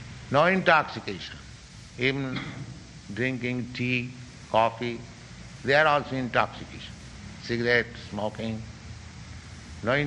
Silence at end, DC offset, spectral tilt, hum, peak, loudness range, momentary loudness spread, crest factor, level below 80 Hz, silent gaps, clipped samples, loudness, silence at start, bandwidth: 0 s; under 0.1%; -5.5 dB/octave; none; -4 dBFS; 4 LU; 22 LU; 24 dB; -52 dBFS; none; under 0.1%; -26 LUFS; 0 s; 10.5 kHz